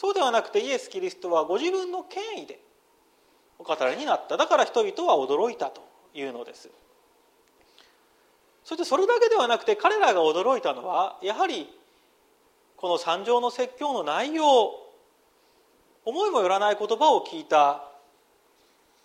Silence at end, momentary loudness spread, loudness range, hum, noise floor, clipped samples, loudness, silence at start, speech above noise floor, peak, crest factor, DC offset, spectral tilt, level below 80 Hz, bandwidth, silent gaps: 1.15 s; 15 LU; 7 LU; none; -63 dBFS; under 0.1%; -25 LUFS; 0 s; 39 dB; -8 dBFS; 18 dB; under 0.1%; -2.5 dB/octave; -78 dBFS; 13.5 kHz; none